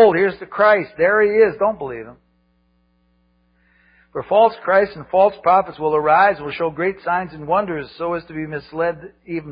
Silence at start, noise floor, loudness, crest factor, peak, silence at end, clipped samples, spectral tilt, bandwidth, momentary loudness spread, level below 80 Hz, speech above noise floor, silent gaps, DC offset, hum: 0 s; -62 dBFS; -18 LUFS; 16 dB; -2 dBFS; 0 s; under 0.1%; -10.5 dB/octave; 5.2 kHz; 14 LU; -54 dBFS; 44 dB; none; under 0.1%; none